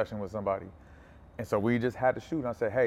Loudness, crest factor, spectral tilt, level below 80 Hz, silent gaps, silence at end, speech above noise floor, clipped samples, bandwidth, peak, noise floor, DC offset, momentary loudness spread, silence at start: -31 LUFS; 18 dB; -7.5 dB/octave; -56 dBFS; none; 0 s; 23 dB; under 0.1%; 14.5 kHz; -14 dBFS; -53 dBFS; under 0.1%; 14 LU; 0 s